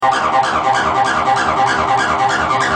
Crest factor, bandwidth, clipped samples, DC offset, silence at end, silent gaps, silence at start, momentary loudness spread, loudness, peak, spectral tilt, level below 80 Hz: 12 dB; 10.5 kHz; under 0.1%; under 0.1%; 0 s; none; 0 s; 1 LU; -14 LUFS; -2 dBFS; -3.5 dB/octave; -44 dBFS